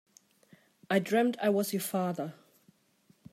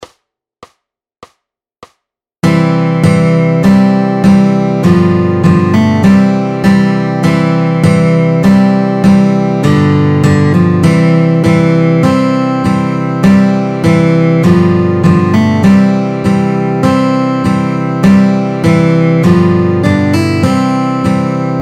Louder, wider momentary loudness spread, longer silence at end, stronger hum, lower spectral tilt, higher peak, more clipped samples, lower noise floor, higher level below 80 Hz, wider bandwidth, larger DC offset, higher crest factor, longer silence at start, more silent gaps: second, -30 LUFS vs -9 LUFS; first, 9 LU vs 4 LU; first, 1 s vs 0 s; neither; second, -5 dB/octave vs -8 dB/octave; second, -12 dBFS vs 0 dBFS; second, under 0.1% vs 0.5%; about the same, -67 dBFS vs -70 dBFS; second, -84 dBFS vs -40 dBFS; first, 16 kHz vs 11.5 kHz; neither; first, 20 dB vs 8 dB; first, 0.9 s vs 0 s; neither